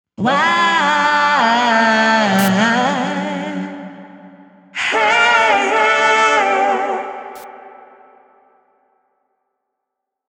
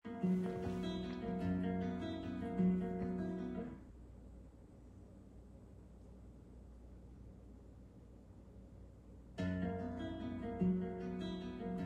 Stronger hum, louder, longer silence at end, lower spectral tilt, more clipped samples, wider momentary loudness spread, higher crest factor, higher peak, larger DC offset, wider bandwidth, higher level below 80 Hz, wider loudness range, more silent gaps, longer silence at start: neither; first, -14 LUFS vs -41 LUFS; first, 2.6 s vs 0 s; second, -4 dB/octave vs -8.5 dB/octave; neither; second, 17 LU vs 22 LU; about the same, 16 dB vs 18 dB; first, -2 dBFS vs -26 dBFS; neither; first, 15 kHz vs 8 kHz; second, -66 dBFS vs -58 dBFS; second, 7 LU vs 19 LU; neither; first, 0.2 s vs 0.05 s